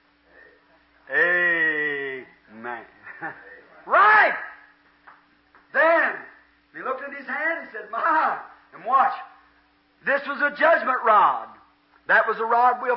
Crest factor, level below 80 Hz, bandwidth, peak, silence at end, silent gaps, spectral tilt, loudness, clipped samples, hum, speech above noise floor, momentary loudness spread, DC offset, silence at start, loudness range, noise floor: 18 dB; -74 dBFS; 5.8 kHz; -6 dBFS; 0 s; none; -7.5 dB/octave; -21 LUFS; under 0.1%; none; 42 dB; 19 LU; under 0.1%; 1.1 s; 4 LU; -61 dBFS